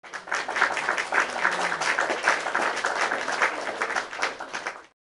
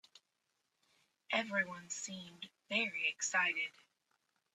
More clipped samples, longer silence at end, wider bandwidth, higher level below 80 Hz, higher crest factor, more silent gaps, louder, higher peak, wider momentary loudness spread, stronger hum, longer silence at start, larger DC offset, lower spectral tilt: neither; second, 0.25 s vs 0.85 s; second, 11.5 kHz vs 14 kHz; first, -68 dBFS vs -88 dBFS; about the same, 22 dB vs 22 dB; neither; first, -25 LUFS vs -36 LUFS; first, -6 dBFS vs -20 dBFS; second, 8 LU vs 14 LU; neither; second, 0.05 s vs 1.3 s; neither; about the same, -1 dB/octave vs -1.5 dB/octave